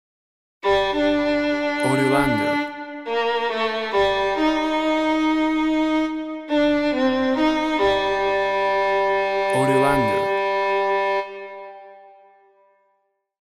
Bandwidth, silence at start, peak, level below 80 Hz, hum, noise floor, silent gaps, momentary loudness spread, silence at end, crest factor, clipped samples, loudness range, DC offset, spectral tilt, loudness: 13 kHz; 0.65 s; -4 dBFS; -48 dBFS; none; -69 dBFS; none; 7 LU; 1.3 s; 16 dB; under 0.1%; 2 LU; under 0.1%; -5.5 dB/octave; -20 LUFS